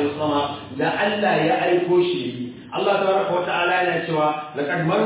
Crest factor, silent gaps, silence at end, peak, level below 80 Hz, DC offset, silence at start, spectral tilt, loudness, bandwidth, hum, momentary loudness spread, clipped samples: 14 dB; none; 0 s; -8 dBFS; -60 dBFS; under 0.1%; 0 s; -9.5 dB/octave; -21 LUFS; 4 kHz; none; 8 LU; under 0.1%